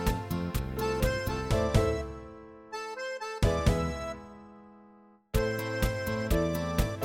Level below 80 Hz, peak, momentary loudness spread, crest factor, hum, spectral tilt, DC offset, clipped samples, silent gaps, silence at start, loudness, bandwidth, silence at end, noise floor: -36 dBFS; -10 dBFS; 15 LU; 22 dB; none; -6 dB/octave; under 0.1%; under 0.1%; none; 0 s; -31 LUFS; 17 kHz; 0 s; -58 dBFS